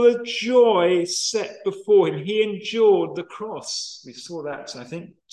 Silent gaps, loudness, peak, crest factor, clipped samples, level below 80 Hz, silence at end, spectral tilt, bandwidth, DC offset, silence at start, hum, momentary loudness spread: none; -21 LUFS; -6 dBFS; 16 dB; under 0.1%; -74 dBFS; 0.25 s; -4 dB/octave; 12 kHz; under 0.1%; 0 s; none; 17 LU